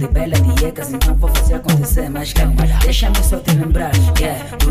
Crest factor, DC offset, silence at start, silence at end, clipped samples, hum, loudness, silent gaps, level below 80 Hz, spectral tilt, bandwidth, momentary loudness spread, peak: 10 dB; under 0.1%; 0 s; 0 s; under 0.1%; none; -16 LUFS; none; -16 dBFS; -5 dB/octave; 16 kHz; 5 LU; -2 dBFS